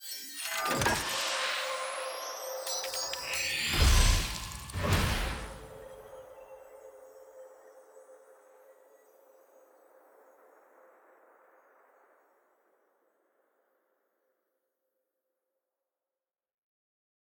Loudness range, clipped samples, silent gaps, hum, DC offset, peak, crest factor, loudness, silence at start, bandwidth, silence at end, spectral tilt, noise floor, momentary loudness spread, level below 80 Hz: 23 LU; under 0.1%; none; none; under 0.1%; -10 dBFS; 24 dB; -31 LUFS; 0 s; over 20 kHz; 8.55 s; -3 dB/octave; under -90 dBFS; 25 LU; -40 dBFS